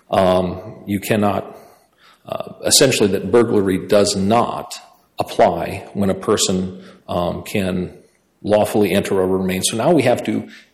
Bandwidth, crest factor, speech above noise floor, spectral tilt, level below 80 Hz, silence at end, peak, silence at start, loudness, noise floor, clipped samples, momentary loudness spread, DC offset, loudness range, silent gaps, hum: 16 kHz; 18 dB; 35 dB; -4.5 dB/octave; -52 dBFS; 0.15 s; 0 dBFS; 0.1 s; -17 LUFS; -52 dBFS; under 0.1%; 14 LU; under 0.1%; 4 LU; none; none